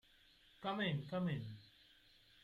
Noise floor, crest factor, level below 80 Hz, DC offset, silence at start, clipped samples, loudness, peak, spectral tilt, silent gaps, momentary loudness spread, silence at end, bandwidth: -69 dBFS; 18 dB; -74 dBFS; under 0.1%; 0.6 s; under 0.1%; -42 LUFS; -28 dBFS; -7.5 dB/octave; none; 17 LU; 0.75 s; 7.2 kHz